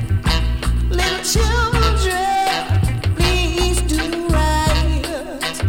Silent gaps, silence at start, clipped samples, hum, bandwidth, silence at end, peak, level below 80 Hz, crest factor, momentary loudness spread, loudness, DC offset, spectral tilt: none; 0 s; under 0.1%; none; 17 kHz; 0 s; -4 dBFS; -20 dBFS; 12 dB; 4 LU; -18 LUFS; under 0.1%; -4.5 dB/octave